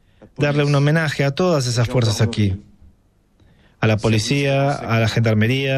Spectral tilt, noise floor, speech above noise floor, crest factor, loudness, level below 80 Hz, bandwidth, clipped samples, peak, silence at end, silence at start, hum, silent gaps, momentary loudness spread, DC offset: -6 dB/octave; -57 dBFS; 40 dB; 16 dB; -18 LUFS; -46 dBFS; 13.5 kHz; under 0.1%; -4 dBFS; 0 s; 0.2 s; none; none; 5 LU; under 0.1%